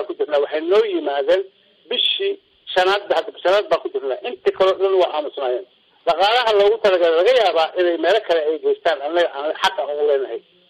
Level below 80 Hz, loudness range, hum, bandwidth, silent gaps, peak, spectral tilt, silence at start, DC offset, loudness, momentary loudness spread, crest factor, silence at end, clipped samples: -62 dBFS; 3 LU; none; 12 kHz; none; -8 dBFS; -3 dB/octave; 0 s; under 0.1%; -18 LUFS; 9 LU; 12 dB; 0.3 s; under 0.1%